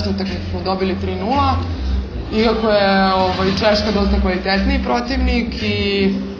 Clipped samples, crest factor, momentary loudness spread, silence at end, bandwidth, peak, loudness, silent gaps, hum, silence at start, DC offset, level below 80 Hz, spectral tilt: under 0.1%; 16 dB; 8 LU; 0 s; 7.2 kHz; 0 dBFS; -17 LUFS; none; none; 0 s; under 0.1%; -26 dBFS; -6.5 dB/octave